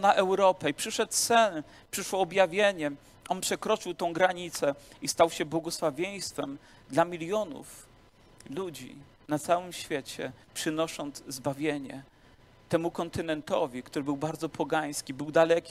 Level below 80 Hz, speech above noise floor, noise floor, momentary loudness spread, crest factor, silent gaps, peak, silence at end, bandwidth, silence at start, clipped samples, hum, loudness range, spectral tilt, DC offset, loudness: -64 dBFS; 28 dB; -58 dBFS; 14 LU; 22 dB; none; -8 dBFS; 0 s; 15.5 kHz; 0 s; under 0.1%; none; 7 LU; -3.5 dB/octave; under 0.1%; -30 LUFS